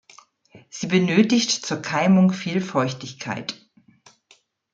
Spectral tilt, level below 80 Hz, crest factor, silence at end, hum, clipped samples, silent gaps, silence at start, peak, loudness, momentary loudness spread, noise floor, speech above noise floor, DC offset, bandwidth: -5 dB/octave; -66 dBFS; 18 dB; 1.2 s; none; under 0.1%; none; 0.55 s; -4 dBFS; -21 LUFS; 15 LU; -59 dBFS; 38 dB; under 0.1%; 7.8 kHz